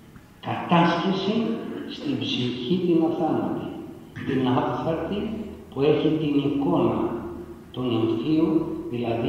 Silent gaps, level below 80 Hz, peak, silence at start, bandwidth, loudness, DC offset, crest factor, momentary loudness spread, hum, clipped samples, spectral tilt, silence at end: none; -54 dBFS; -6 dBFS; 0.05 s; 8.4 kHz; -25 LUFS; under 0.1%; 18 dB; 13 LU; none; under 0.1%; -7.5 dB/octave; 0 s